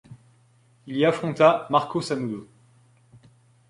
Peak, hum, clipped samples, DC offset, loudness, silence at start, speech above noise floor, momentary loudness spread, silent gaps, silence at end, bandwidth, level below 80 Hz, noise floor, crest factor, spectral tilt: -4 dBFS; none; under 0.1%; under 0.1%; -23 LUFS; 0.1 s; 37 dB; 14 LU; none; 1.25 s; 11.5 kHz; -66 dBFS; -59 dBFS; 22 dB; -6 dB/octave